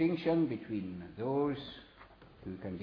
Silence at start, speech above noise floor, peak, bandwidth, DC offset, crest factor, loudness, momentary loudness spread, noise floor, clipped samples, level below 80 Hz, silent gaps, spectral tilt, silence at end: 0 s; 23 dB; -20 dBFS; 5.4 kHz; under 0.1%; 16 dB; -35 LUFS; 18 LU; -57 dBFS; under 0.1%; -64 dBFS; none; -6.5 dB/octave; 0 s